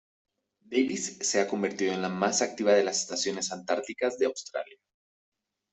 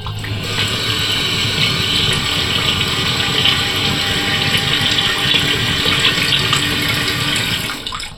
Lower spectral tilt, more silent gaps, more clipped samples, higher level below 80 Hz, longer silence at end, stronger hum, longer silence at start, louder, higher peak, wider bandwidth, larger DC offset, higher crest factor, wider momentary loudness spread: about the same, -3 dB/octave vs -2.5 dB/octave; neither; neither; second, -74 dBFS vs -36 dBFS; first, 1 s vs 0 s; neither; first, 0.7 s vs 0 s; second, -28 LUFS vs -14 LUFS; second, -10 dBFS vs 0 dBFS; second, 8.4 kHz vs 19 kHz; neither; about the same, 20 dB vs 16 dB; first, 8 LU vs 5 LU